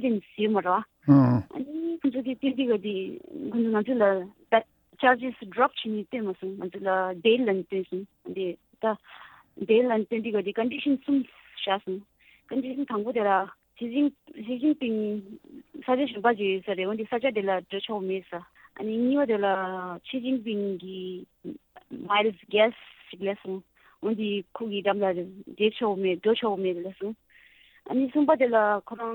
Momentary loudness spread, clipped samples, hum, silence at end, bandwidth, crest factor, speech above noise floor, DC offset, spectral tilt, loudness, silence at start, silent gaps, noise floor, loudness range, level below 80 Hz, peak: 14 LU; under 0.1%; none; 0 s; 19.5 kHz; 20 dB; 31 dB; under 0.1%; -9 dB/octave; -27 LUFS; 0 s; none; -57 dBFS; 3 LU; -70 dBFS; -8 dBFS